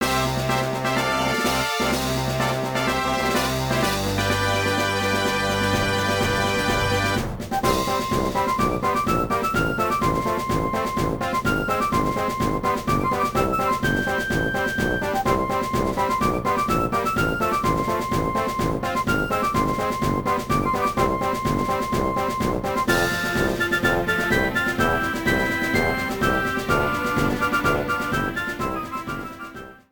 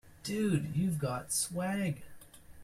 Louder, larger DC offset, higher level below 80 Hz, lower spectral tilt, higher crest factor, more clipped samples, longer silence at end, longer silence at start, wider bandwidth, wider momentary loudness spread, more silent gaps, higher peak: first, -22 LUFS vs -33 LUFS; first, 0.1% vs under 0.1%; first, -38 dBFS vs -60 dBFS; about the same, -4.5 dB/octave vs -5 dB/octave; about the same, 16 dB vs 18 dB; neither; first, 0.15 s vs 0 s; about the same, 0 s vs 0.05 s; first, over 20 kHz vs 15.5 kHz; second, 3 LU vs 6 LU; neither; first, -6 dBFS vs -18 dBFS